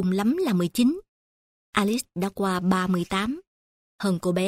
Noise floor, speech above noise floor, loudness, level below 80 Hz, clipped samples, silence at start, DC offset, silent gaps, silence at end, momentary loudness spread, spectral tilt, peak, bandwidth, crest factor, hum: under -90 dBFS; over 66 dB; -25 LUFS; -56 dBFS; under 0.1%; 0 s; under 0.1%; 1.08-1.73 s, 3.47-3.99 s; 0 s; 7 LU; -6 dB/octave; -6 dBFS; 16 kHz; 18 dB; none